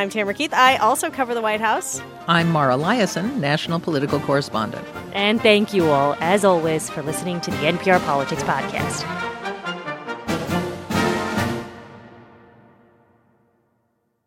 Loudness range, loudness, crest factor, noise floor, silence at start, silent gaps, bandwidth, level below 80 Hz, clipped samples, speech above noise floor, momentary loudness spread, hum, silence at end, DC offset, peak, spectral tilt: 7 LU; -20 LUFS; 20 dB; -69 dBFS; 0 s; none; 16.5 kHz; -54 dBFS; under 0.1%; 49 dB; 12 LU; none; 2.05 s; under 0.1%; -2 dBFS; -4.5 dB/octave